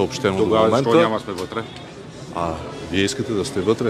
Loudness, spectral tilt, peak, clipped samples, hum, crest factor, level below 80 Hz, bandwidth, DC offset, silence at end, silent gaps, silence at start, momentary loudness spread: -20 LUFS; -5.5 dB/octave; -2 dBFS; under 0.1%; none; 18 dB; -48 dBFS; 14.5 kHz; under 0.1%; 0 s; none; 0 s; 17 LU